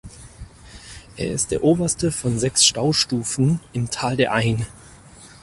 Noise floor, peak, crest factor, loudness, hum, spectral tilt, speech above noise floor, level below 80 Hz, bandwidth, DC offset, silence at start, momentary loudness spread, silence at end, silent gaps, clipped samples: -45 dBFS; -2 dBFS; 20 dB; -20 LUFS; none; -4 dB/octave; 24 dB; -46 dBFS; 11.5 kHz; under 0.1%; 0.05 s; 17 LU; 0.15 s; none; under 0.1%